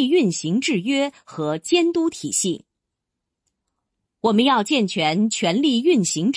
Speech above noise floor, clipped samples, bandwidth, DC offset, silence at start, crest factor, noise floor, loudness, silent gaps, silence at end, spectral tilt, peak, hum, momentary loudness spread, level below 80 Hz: 62 dB; under 0.1%; 10.5 kHz; under 0.1%; 0 s; 16 dB; -82 dBFS; -20 LUFS; none; 0 s; -4 dB/octave; -6 dBFS; none; 8 LU; -68 dBFS